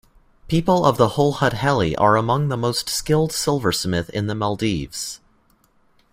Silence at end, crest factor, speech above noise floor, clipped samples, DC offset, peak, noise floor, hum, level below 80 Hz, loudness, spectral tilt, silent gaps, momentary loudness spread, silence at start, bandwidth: 0.95 s; 18 dB; 40 dB; under 0.1%; under 0.1%; -2 dBFS; -59 dBFS; none; -44 dBFS; -20 LUFS; -5 dB/octave; none; 9 LU; 0.45 s; 16 kHz